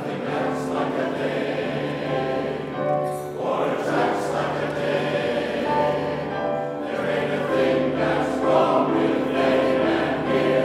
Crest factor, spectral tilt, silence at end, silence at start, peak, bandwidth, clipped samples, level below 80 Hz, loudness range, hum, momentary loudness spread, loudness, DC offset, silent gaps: 18 dB; -6.5 dB/octave; 0 s; 0 s; -4 dBFS; 14 kHz; under 0.1%; -52 dBFS; 4 LU; none; 7 LU; -23 LUFS; under 0.1%; none